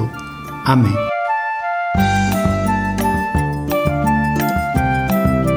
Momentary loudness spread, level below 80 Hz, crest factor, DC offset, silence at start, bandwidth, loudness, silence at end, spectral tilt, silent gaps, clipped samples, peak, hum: 5 LU; -30 dBFS; 16 dB; under 0.1%; 0 s; over 20 kHz; -17 LUFS; 0 s; -6.5 dB/octave; none; under 0.1%; -2 dBFS; none